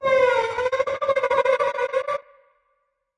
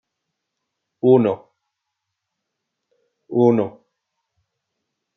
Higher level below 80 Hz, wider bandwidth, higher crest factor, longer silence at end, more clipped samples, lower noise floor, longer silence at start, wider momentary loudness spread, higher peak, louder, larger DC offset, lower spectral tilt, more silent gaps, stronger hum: first, -60 dBFS vs -76 dBFS; first, 10 kHz vs 5.8 kHz; second, 14 dB vs 20 dB; second, 0.95 s vs 1.45 s; neither; second, -72 dBFS vs -80 dBFS; second, 0 s vs 1.05 s; second, 7 LU vs 13 LU; second, -8 dBFS vs -2 dBFS; second, -22 LUFS vs -18 LUFS; neither; second, -3 dB/octave vs -10.5 dB/octave; neither; neither